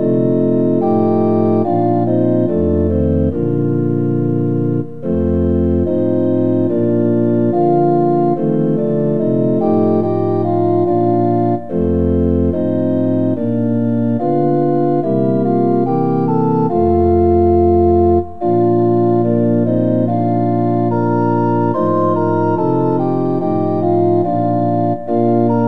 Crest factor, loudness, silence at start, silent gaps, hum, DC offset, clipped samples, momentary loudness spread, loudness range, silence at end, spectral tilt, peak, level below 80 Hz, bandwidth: 12 dB; -15 LUFS; 0 s; none; none; 3%; under 0.1%; 3 LU; 3 LU; 0 s; -12 dB/octave; -2 dBFS; -38 dBFS; 4.4 kHz